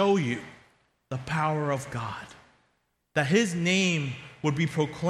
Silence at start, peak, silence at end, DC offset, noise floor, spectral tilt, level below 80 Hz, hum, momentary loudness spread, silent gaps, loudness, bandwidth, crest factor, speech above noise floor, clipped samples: 0 s; -10 dBFS; 0 s; under 0.1%; -73 dBFS; -5 dB/octave; -62 dBFS; none; 14 LU; none; -28 LUFS; 13 kHz; 18 dB; 46 dB; under 0.1%